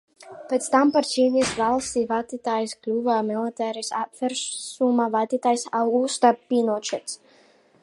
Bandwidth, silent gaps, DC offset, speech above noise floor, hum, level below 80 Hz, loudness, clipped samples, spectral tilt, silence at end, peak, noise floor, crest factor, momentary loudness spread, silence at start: 11.5 kHz; none; under 0.1%; 34 dB; none; -62 dBFS; -23 LUFS; under 0.1%; -3.5 dB/octave; 0.65 s; -4 dBFS; -57 dBFS; 20 dB; 9 LU; 0.2 s